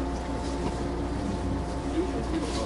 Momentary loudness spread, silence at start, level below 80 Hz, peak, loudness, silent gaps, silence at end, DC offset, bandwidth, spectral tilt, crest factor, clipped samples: 2 LU; 0 s; -34 dBFS; -18 dBFS; -31 LUFS; none; 0 s; under 0.1%; 11.5 kHz; -6 dB/octave; 12 dB; under 0.1%